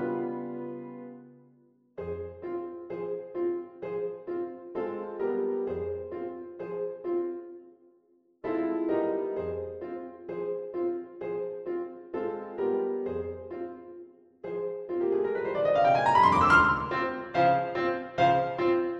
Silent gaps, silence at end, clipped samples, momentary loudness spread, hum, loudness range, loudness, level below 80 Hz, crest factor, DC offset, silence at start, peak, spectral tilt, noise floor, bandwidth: none; 0 s; under 0.1%; 16 LU; none; 12 LU; -29 LUFS; -58 dBFS; 22 dB; under 0.1%; 0 s; -8 dBFS; -7 dB/octave; -65 dBFS; 10.5 kHz